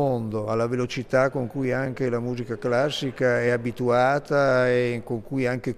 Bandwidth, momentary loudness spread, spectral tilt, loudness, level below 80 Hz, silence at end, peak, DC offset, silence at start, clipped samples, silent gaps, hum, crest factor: 14 kHz; 7 LU; -6.5 dB/octave; -24 LUFS; -52 dBFS; 0 s; -8 dBFS; under 0.1%; 0 s; under 0.1%; none; none; 16 dB